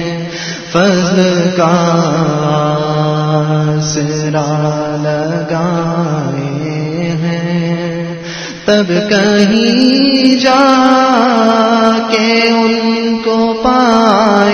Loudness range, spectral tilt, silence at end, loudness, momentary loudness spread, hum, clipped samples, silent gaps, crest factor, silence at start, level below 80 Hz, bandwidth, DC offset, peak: 7 LU; -5.5 dB/octave; 0 s; -11 LUFS; 9 LU; none; 0.2%; none; 12 dB; 0 s; -46 dBFS; 8.4 kHz; under 0.1%; 0 dBFS